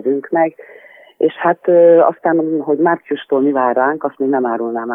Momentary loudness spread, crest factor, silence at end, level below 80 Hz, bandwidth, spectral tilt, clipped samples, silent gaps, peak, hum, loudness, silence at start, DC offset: 9 LU; 14 dB; 0 s; -70 dBFS; 3.7 kHz; -9.5 dB/octave; under 0.1%; none; -2 dBFS; none; -15 LUFS; 0.05 s; under 0.1%